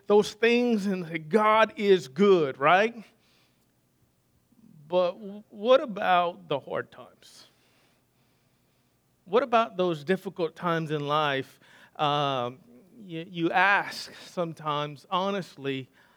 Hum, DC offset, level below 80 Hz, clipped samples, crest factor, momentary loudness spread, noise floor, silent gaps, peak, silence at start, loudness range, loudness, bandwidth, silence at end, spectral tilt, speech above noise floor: none; under 0.1%; -78 dBFS; under 0.1%; 22 dB; 14 LU; -68 dBFS; none; -6 dBFS; 0.1 s; 7 LU; -26 LUFS; 16 kHz; 0.35 s; -5.5 dB/octave; 42 dB